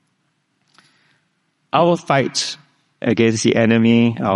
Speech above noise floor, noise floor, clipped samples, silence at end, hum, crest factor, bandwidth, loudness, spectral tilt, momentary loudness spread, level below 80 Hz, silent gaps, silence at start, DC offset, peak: 52 dB; -67 dBFS; under 0.1%; 0 s; none; 18 dB; 11.5 kHz; -16 LUFS; -5 dB/octave; 10 LU; -60 dBFS; none; 1.75 s; under 0.1%; 0 dBFS